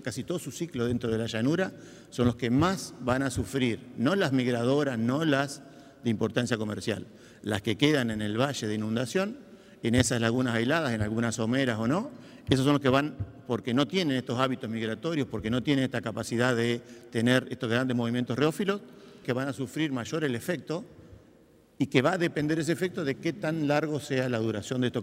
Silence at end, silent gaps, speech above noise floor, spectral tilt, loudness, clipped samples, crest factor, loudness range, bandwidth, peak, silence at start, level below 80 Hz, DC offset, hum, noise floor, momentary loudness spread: 0 s; none; 31 dB; -5.5 dB/octave; -28 LUFS; under 0.1%; 26 dB; 3 LU; 16 kHz; -4 dBFS; 0 s; -56 dBFS; under 0.1%; none; -59 dBFS; 9 LU